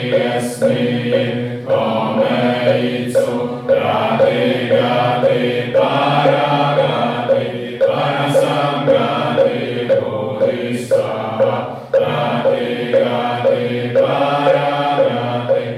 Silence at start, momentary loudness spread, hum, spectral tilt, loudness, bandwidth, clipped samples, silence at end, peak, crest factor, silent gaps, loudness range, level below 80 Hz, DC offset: 0 s; 4 LU; none; -6.5 dB/octave; -16 LUFS; 13 kHz; under 0.1%; 0 s; 0 dBFS; 14 dB; none; 2 LU; -58 dBFS; under 0.1%